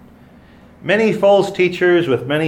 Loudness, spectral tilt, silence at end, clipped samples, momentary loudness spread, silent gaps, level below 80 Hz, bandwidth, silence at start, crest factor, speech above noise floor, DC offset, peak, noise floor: -15 LUFS; -6 dB/octave; 0 s; under 0.1%; 5 LU; none; -54 dBFS; 12.5 kHz; 0.85 s; 14 dB; 30 dB; under 0.1%; -2 dBFS; -44 dBFS